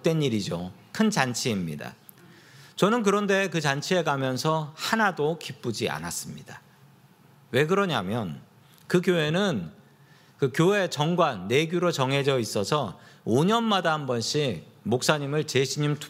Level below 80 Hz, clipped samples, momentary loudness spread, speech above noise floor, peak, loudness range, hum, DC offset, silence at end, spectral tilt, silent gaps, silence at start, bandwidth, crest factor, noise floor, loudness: -66 dBFS; under 0.1%; 12 LU; 30 dB; -4 dBFS; 4 LU; none; under 0.1%; 0 s; -5 dB/octave; none; 0.05 s; 16 kHz; 22 dB; -56 dBFS; -25 LUFS